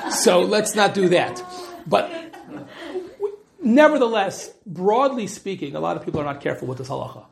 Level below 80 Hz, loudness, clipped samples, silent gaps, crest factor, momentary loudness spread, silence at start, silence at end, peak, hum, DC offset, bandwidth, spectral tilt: -60 dBFS; -21 LUFS; under 0.1%; none; 20 dB; 19 LU; 0 s; 0.1 s; -2 dBFS; none; under 0.1%; 14.5 kHz; -4 dB/octave